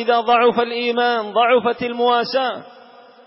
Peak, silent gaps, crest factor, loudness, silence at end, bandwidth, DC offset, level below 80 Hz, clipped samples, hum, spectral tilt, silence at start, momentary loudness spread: -6 dBFS; none; 12 dB; -17 LUFS; 0.6 s; 5.8 kHz; under 0.1%; -66 dBFS; under 0.1%; none; -8 dB/octave; 0 s; 7 LU